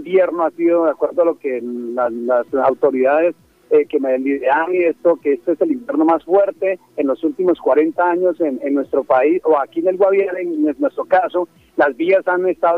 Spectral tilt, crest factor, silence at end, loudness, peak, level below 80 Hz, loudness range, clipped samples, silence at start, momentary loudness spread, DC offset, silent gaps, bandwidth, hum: -7.5 dB/octave; 14 dB; 0 s; -17 LUFS; -2 dBFS; -64 dBFS; 1 LU; under 0.1%; 0 s; 6 LU; under 0.1%; none; 4.8 kHz; none